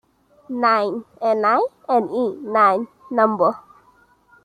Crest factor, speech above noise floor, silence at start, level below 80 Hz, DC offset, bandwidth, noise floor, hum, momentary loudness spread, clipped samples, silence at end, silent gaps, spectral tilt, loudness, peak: 18 dB; 37 dB; 0.5 s; -70 dBFS; under 0.1%; 9.8 kHz; -56 dBFS; none; 9 LU; under 0.1%; 0.85 s; none; -6.5 dB/octave; -19 LUFS; -2 dBFS